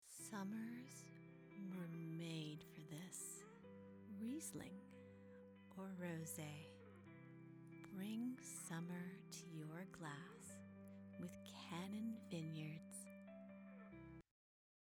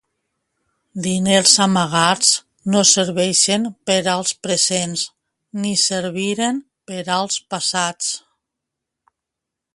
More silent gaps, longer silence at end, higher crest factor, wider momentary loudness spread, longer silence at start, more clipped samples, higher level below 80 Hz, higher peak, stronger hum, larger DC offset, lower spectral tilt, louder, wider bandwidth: neither; second, 0.7 s vs 1.55 s; about the same, 22 dB vs 20 dB; about the same, 12 LU vs 13 LU; second, 0 s vs 0.95 s; neither; second, -86 dBFS vs -62 dBFS; second, -32 dBFS vs 0 dBFS; neither; neither; first, -5 dB/octave vs -2.5 dB/octave; second, -53 LUFS vs -17 LUFS; first, over 20 kHz vs 11.5 kHz